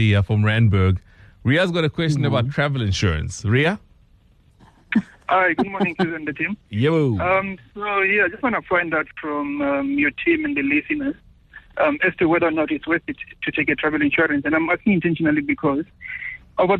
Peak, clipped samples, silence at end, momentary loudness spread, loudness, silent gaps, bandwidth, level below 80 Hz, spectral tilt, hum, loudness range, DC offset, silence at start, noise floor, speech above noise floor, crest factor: -8 dBFS; under 0.1%; 0 s; 9 LU; -20 LUFS; none; 9.8 kHz; -44 dBFS; -6.5 dB/octave; none; 2 LU; under 0.1%; 0 s; -54 dBFS; 34 dB; 14 dB